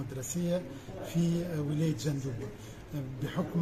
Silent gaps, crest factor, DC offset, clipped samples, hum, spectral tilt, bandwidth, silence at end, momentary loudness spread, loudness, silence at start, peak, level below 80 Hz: none; 14 dB; under 0.1%; under 0.1%; none; -6.5 dB/octave; 15 kHz; 0 s; 12 LU; -34 LUFS; 0 s; -20 dBFS; -54 dBFS